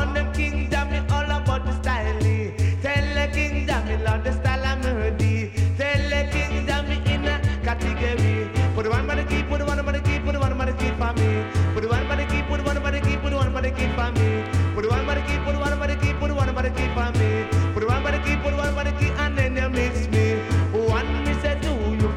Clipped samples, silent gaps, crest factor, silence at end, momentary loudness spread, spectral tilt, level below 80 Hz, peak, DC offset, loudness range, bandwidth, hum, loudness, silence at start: under 0.1%; none; 14 dB; 0 s; 2 LU; -6.5 dB/octave; -26 dBFS; -8 dBFS; under 0.1%; 1 LU; 11 kHz; none; -23 LUFS; 0 s